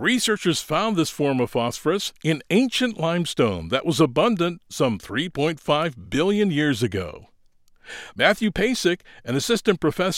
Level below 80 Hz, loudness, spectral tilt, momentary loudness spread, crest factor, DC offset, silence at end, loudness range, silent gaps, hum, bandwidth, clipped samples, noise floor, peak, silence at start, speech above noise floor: -50 dBFS; -22 LUFS; -4.5 dB/octave; 6 LU; 20 dB; under 0.1%; 0 s; 2 LU; none; none; 16.5 kHz; under 0.1%; -56 dBFS; -2 dBFS; 0 s; 34 dB